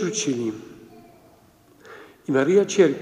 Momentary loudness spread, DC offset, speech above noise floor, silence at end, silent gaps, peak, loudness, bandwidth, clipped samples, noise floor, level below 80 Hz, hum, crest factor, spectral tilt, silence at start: 26 LU; under 0.1%; 34 dB; 0 s; none; -4 dBFS; -21 LUFS; 10.5 kHz; under 0.1%; -54 dBFS; -68 dBFS; none; 18 dB; -4.5 dB/octave; 0 s